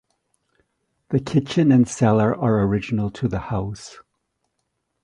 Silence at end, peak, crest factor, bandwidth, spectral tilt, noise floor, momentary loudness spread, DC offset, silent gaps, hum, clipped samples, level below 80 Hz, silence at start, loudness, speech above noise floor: 1.1 s; -4 dBFS; 18 dB; 11 kHz; -7 dB/octave; -75 dBFS; 11 LU; under 0.1%; none; none; under 0.1%; -46 dBFS; 1.1 s; -20 LUFS; 55 dB